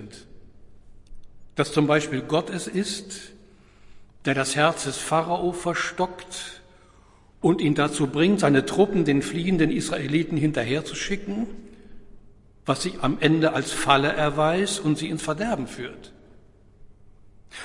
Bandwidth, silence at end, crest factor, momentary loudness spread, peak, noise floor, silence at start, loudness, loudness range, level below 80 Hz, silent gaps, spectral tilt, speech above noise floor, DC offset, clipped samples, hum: 11.5 kHz; 0 s; 24 dB; 14 LU; -2 dBFS; -54 dBFS; 0 s; -24 LUFS; 5 LU; -50 dBFS; none; -5 dB/octave; 30 dB; under 0.1%; under 0.1%; 50 Hz at -50 dBFS